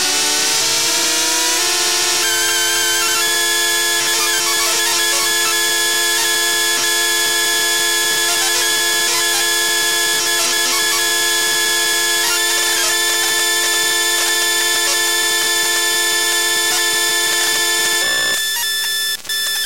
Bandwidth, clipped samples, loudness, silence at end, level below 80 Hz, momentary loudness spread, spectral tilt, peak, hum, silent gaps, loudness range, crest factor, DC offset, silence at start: 16 kHz; under 0.1%; -13 LUFS; 0 s; -54 dBFS; 0 LU; 1.5 dB/octave; -2 dBFS; none; none; 0 LU; 14 dB; 1%; 0 s